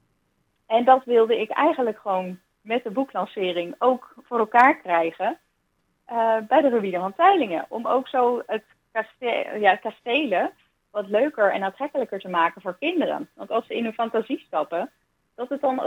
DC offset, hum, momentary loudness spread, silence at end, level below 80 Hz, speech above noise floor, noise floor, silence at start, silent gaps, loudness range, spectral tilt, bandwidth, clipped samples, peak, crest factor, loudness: under 0.1%; none; 12 LU; 0 s; -76 dBFS; 48 dB; -71 dBFS; 0.7 s; none; 4 LU; -6 dB/octave; 15.5 kHz; under 0.1%; -4 dBFS; 20 dB; -23 LUFS